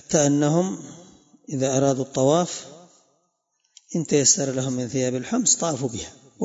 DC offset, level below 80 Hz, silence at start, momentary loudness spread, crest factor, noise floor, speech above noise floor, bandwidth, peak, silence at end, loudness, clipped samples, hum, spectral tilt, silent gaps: under 0.1%; -62 dBFS; 0.1 s; 15 LU; 20 dB; -72 dBFS; 50 dB; 8 kHz; -4 dBFS; 0 s; -22 LUFS; under 0.1%; none; -4 dB/octave; none